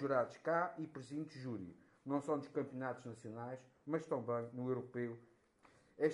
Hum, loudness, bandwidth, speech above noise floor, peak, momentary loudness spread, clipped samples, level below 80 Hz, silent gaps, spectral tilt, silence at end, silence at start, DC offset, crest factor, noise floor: none; -43 LUFS; 11.5 kHz; 28 dB; -22 dBFS; 12 LU; under 0.1%; -84 dBFS; none; -7.5 dB/octave; 0 s; 0 s; under 0.1%; 20 dB; -70 dBFS